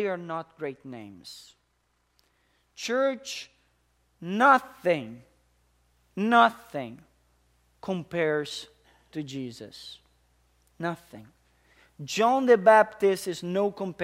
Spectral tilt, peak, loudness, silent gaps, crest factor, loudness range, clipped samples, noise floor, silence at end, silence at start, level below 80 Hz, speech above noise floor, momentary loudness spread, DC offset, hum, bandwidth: -5 dB/octave; -4 dBFS; -25 LUFS; none; 24 dB; 10 LU; under 0.1%; -72 dBFS; 0 s; 0 s; -70 dBFS; 46 dB; 23 LU; under 0.1%; 60 Hz at -65 dBFS; 16 kHz